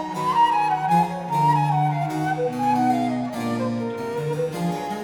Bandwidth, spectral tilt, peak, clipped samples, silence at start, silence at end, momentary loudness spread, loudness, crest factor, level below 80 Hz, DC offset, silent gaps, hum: 18.5 kHz; -6.5 dB/octave; -8 dBFS; under 0.1%; 0 s; 0 s; 7 LU; -22 LUFS; 14 dB; -60 dBFS; under 0.1%; none; none